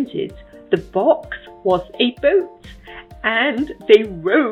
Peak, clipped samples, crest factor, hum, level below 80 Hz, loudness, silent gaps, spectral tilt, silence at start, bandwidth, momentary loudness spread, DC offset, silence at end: 0 dBFS; under 0.1%; 18 dB; none; -46 dBFS; -18 LUFS; none; -6.5 dB/octave; 0 s; 7 kHz; 19 LU; under 0.1%; 0 s